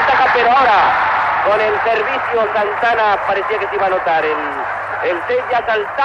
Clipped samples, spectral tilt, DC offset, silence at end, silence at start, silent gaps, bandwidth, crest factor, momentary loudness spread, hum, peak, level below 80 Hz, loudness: under 0.1%; -4.5 dB/octave; under 0.1%; 0 s; 0 s; none; 9.4 kHz; 10 dB; 7 LU; none; -4 dBFS; -48 dBFS; -15 LUFS